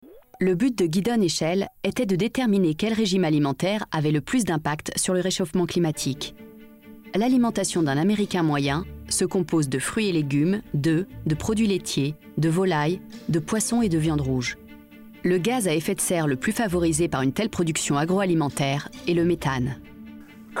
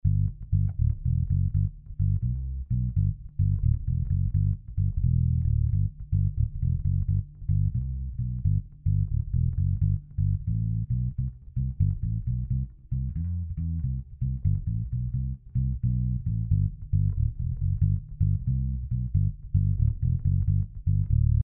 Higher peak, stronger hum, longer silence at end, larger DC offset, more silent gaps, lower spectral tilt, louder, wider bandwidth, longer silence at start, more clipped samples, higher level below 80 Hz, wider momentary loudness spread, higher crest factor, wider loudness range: about the same, -12 dBFS vs -12 dBFS; neither; about the same, 0 s vs 0 s; neither; neither; second, -5 dB/octave vs -18 dB/octave; first, -24 LUFS vs -28 LUFS; first, 16.5 kHz vs 0.5 kHz; about the same, 0.05 s vs 0.05 s; neither; second, -48 dBFS vs -32 dBFS; about the same, 6 LU vs 6 LU; about the same, 12 dB vs 14 dB; about the same, 2 LU vs 3 LU